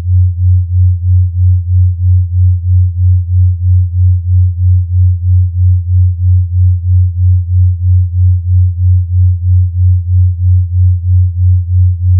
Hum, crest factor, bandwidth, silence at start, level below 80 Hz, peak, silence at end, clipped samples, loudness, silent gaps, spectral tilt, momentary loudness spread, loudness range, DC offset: none; 6 dB; 0.2 kHz; 0 s; -22 dBFS; -2 dBFS; 0 s; under 0.1%; -11 LUFS; none; -28.5 dB/octave; 1 LU; 0 LU; under 0.1%